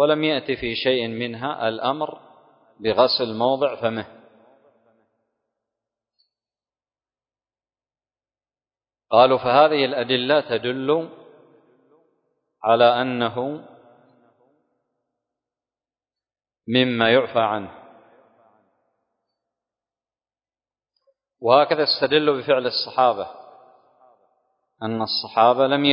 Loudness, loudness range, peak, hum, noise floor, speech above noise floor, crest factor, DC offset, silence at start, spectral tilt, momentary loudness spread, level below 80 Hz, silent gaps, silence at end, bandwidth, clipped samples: -20 LUFS; 9 LU; -2 dBFS; none; under -90 dBFS; over 70 dB; 22 dB; under 0.1%; 0 s; -9 dB/octave; 13 LU; -64 dBFS; none; 0 s; 5.4 kHz; under 0.1%